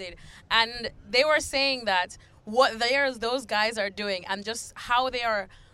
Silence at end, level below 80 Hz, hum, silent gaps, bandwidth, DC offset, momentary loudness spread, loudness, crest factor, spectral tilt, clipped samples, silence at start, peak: 0.25 s; -54 dBFS; none; none; 15.5 kHz; under 0.1%; 11 LU; -26 LUFS; 22 dB; -2 dB/octave; under 0.1%; 0 s; -6 dBFS